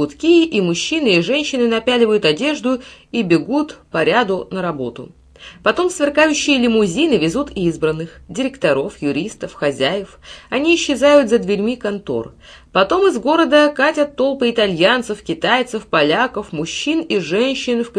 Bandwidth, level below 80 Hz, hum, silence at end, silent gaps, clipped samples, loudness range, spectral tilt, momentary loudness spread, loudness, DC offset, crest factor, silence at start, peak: 11 kHz; -48 dBFS; none; 0 s; none; under 0.1%; 4 LU; -4.5 dB/octave; 10 LU; -16 LUFS; under 0.1%; 16 dB; 0 s; 0 dBFS